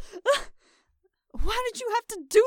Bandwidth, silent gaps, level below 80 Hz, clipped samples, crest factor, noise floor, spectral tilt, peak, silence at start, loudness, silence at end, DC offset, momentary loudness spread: 17.5 kHz; none; -38 dBFS; under 0.1%; 18 dB; -71 dBFS; -2.5 dB/octave; -8 dBFS; 0 s; -28 LUFS; 0 s; under 0.1%; 17 LU